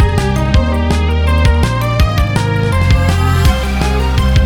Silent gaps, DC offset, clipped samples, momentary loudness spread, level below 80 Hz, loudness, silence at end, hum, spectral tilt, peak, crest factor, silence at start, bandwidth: none; under 0.1%; under 0.1%; 2 LU; -16 dBFS; -13 LUFS; 0 s; none; -6 dB/octave; -2 dBFS; 10 dB; 0 s; 17 kHz